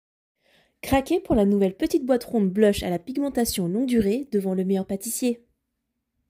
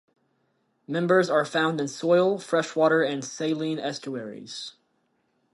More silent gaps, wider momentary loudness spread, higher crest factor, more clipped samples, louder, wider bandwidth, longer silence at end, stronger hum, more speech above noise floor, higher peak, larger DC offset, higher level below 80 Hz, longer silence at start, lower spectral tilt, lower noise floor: neither; second, 7 LU vs 15 LU; about the same, 18 dB vs 18 dB; neither; about the same, -24 LUFS vs -25 LUFS; first, 16 kHz vs 11.5 kHz; about the same, 0.95 s vs 0.85 s; neither; first, 56 dB vs 47 dB; about the same, -6 dBFS vs -8 dBFS; neither; first, -46 dBFS vs -78 dBFS; about the same, 0.85 s vs 0.9 s; about the same, -5.5 dB/octave vs -5 dB/octave; first, -79 dBFS vs -71 dBFS